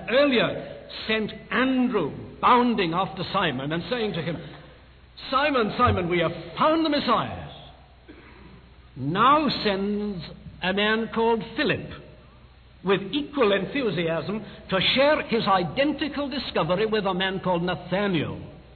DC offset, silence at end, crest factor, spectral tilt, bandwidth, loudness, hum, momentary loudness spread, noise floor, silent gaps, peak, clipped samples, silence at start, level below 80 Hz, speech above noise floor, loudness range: under 0.1%; 0 s; 16 dB; -8.5 dB/octave; 4.6 kHz; -24 LUFS; none; 14 LU; -50 dBFS; none; -8 dBFS; under 0.1%; 0 s; -50 dBFS; 26 dB; 3 LU